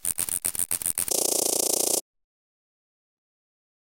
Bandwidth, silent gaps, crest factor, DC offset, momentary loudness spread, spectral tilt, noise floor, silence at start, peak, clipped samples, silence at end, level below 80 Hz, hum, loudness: 17.5 kHz; none; 24 dB; under 0.1%; 4 LU; -0.5 dB/octave; under -90 dBFS; 0.05 s; -4 dBFS; under 0.1%; 2 s; -60 dBFS; none; -24 LUFS